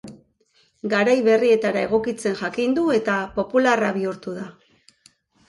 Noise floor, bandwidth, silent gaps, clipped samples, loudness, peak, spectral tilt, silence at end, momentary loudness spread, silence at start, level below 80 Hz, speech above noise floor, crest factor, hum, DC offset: -62 dBFS; 11.5 kHz; none; under 0.1%; -21 LUFS; -6 dBFS; -5.5 dB/octave; 0.95 s; 15 LU; 0.05 s; -58 dBFS; 42 dB; 16 dB; none; under 0.1%